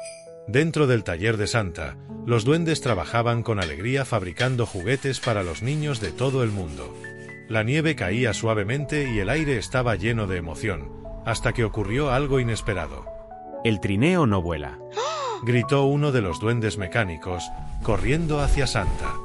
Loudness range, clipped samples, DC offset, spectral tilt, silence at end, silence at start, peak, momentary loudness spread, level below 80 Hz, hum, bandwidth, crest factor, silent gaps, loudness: 3 LU; under 0.1%; under 0.1%; -6 dB/octave; 0 s; 0 s; -8 dBFS; 12 LU; -36 dBFS; none; 12 kHz; 16 dB; none; -24 LUFS